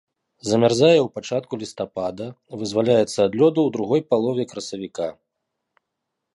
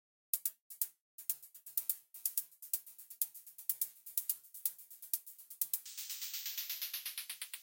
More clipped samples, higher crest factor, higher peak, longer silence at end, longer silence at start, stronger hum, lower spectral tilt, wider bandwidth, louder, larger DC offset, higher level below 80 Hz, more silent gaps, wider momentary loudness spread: neither; second, 18 dB vs 28 dB; first, -2 dBFS vs -14 dBFS; first, 1.25 s vs 0 s; about the same, 0.45 s vs 0.35 s; neither; first, -5.5 dB/octave vs 5 dB/octave; second, 11.5 kHz vs 17 kHz; first, -21 LUFS vs -39 LUFS; neither; first, -62 dBFS vs under -90 dBFS; second, none vs 0.61-0.70 s, 1.00-1.18 s; first, 15 LU vs 6 LU